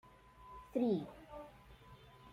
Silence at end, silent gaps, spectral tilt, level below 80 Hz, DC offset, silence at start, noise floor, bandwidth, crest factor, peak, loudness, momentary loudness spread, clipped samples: 0 s; none; -8.5 dB/octave; -66 dBFS; under 0.1%; 0.05 s; -60 dBFS; 15 kHz; 20 dB; -24 dBFS; -39 LUFS; 24 LU; under 0.1%